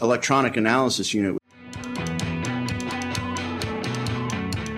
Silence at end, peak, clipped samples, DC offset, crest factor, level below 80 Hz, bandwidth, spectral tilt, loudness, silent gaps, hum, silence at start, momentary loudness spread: 0 s; -4 dBFS; under 0.1%; under 0.1%; 20 dB; -48 dBFS; 15.5 kHz; -4.5 dB/octave; -25 LUFS; none; none; 0 s; 10 LU